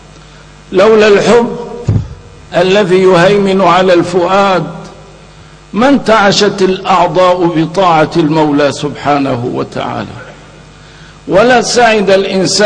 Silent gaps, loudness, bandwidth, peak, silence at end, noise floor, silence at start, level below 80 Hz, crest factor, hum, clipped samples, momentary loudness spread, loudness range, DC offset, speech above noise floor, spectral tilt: none; -9 LUFS; 10 kHz; 0 dBFS; 0 s; -35 dBFS; 0.7 s; -38 dBFS; 10 dB; none; 0.3%; 11 LU; 4 LU; under 0.1%; 27 dB; -5 dB/octave